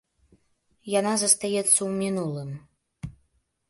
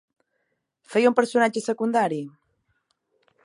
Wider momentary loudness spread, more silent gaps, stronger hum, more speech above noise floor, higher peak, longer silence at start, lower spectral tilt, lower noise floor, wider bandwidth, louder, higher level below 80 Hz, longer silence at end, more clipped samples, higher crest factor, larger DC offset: first, 22 LU vs 10 LU; neither; neither; second, 45 dB vs 54 dB; about the same, -4 dBFS vs -4 dBFS; about the same, 0.85 s vs 0.9 s; second, -3 dB/octave vs -5 dB/octave; second, -70 dBFS vs -76 dBFS; about the same, 12 kHz vs 11.5 kHz; about the same, -23 LUFS vs -23 LUFS; first, -60 dBFS vs -78 dBFS; second, 0.6 s vs 1.15 s; neither; about the same, 24 dB vs 22 dB; neither